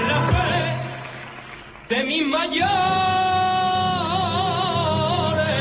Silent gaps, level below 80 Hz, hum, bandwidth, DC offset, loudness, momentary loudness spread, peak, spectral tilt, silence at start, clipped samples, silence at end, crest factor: none; -40 dBFS; none; 4 kHz; under 0.1%; -21 LUFS; 15 LU; -8 dBFS; -9.5 dB/octave; 0 s; under 0.1%; 0 s; 12 dB